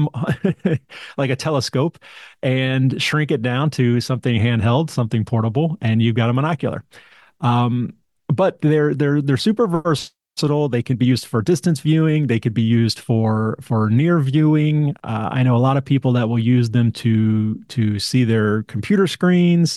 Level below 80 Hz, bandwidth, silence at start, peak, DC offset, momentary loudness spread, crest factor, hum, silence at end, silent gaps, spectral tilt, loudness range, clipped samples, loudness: -58 dBFS; 12.5 kHz; 0 s; -6 dBFS; under 0.1%; 7 LU; 12 dB; none; 0 s; none; -7 dB/octave; 3 LU; under 0.1%; -18 LUFS